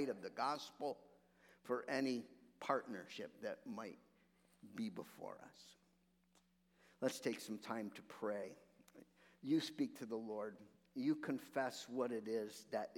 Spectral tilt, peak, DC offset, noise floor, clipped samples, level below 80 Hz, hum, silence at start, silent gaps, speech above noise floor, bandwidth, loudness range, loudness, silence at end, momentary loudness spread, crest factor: -4.5 dB/octave; -22 dBFS; under 0.1%; -78 dBFS; under 0.1%; -90 dBFS; none; 0 s; none; 33 dB; 17.5 kHz; 8 LU; -45 LUFS; 0 s; 15 LU; 24 dB